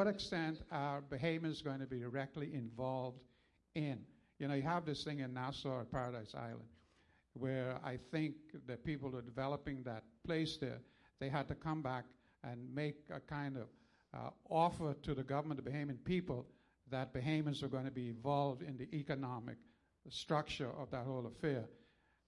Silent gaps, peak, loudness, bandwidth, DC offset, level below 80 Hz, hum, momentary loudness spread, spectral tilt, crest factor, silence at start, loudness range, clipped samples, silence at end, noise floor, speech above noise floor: none; -22 dBFS; -43 LUFS; 11.5 kHz; under 0.1%; -68 dBFS; none; 12 LU; -7 dB/octave; 22 dB; 0 s; 3 LU; under 0.1%; 0.5 s; -74 dBFS; 32 dB